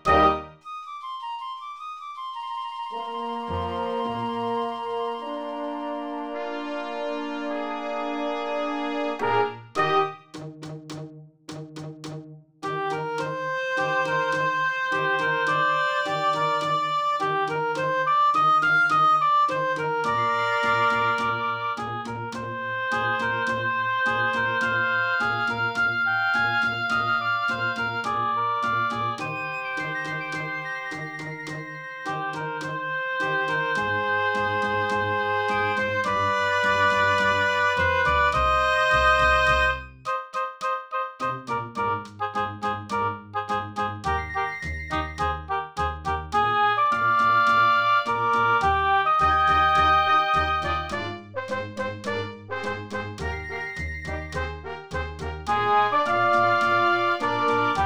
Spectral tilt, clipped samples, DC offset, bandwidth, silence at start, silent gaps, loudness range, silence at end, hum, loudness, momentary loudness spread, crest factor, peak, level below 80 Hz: -4.5 dB/octave; under 0.1%; under 0.1%; over 20 kHz; 0.05 s; none; 10 LU; 0 s; none; -24 LUFS; 13 LU; 20 dB; -6 dBFS; -44 dBFS